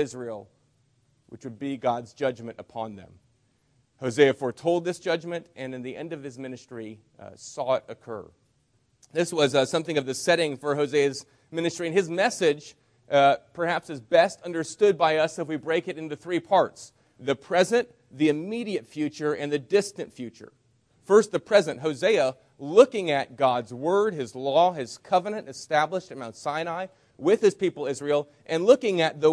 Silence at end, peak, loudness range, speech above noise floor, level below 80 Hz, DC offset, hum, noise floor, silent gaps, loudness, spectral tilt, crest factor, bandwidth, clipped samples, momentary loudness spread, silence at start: 0 s; -4 dBFS; 9 LU; 43 dB; -72 dBFS; under 0.1%; none; -68 dBFS; none; -25 LUFS; -4.5 dB/octave; 22 dB; 11 kHz; under 0.1%; 17 LU; 0 s